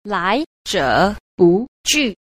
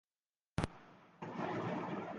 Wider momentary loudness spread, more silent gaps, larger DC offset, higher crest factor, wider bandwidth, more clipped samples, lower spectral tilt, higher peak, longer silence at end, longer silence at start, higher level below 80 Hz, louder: second, 5 LU vs 15 LU; first, 0.46-0.65 s, 1.20-1.38 s, 1.68-1.84 s vs none; neither; second, 16 dB vs 24 dB; first, 15.5 kHz vs 9.4 kHz; neither; second, -4 dB/octave vs -6.5 dB/octave; first, -2 dBFS vs -18 dBFS; about the same, 0.1 s vs 0 s; second, 0.05 s vs 0.55 s; first, -42 dBFS vs -60 dBFS; first, -17 LUFS vs -43 LUFS